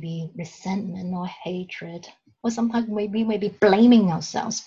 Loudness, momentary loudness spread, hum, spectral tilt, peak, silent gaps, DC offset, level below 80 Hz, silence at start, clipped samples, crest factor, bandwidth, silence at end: -22 LUFS; 19 LU; none; -5.5 dB/octave; -4 dBFS; none; under 0.1%; -62 dBFS; 0 s; under 0.1%; 18 dB; 7.6 kHz; 0 s